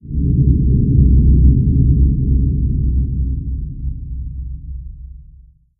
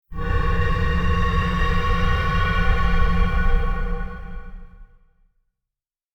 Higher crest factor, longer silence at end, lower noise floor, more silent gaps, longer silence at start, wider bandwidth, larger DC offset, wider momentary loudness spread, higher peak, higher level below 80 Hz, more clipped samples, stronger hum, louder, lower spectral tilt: about the same, 14 dB vs 14 dB; second, 0.6 s vs 1.3 s; second, -44 dBFS vs -87 dBFS; neither; about the same, 0.05 s vs 0.1 s; second, 0.5 kHz vs 6.4 kHz; neither; first, 18 LU vs 12 LU; first, 0 dBFS vs -6 dBFS; first, -16 dBFS vs -22 dBFS; neither; neither; first, -15 LUFS vs -23 LUFS; first, -21 dB/octave vs -7 dB/octave